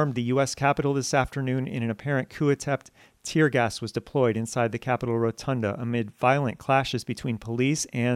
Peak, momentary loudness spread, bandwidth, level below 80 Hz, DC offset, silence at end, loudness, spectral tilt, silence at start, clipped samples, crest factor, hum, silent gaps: -6 dBFS; 7 LU; 14.5 kHz; -54 dBFS; under 0.1%; 0 s; -26 LUFS; -5.5 dB/octave; 0 s; under 0.1%; 20 dB; none; none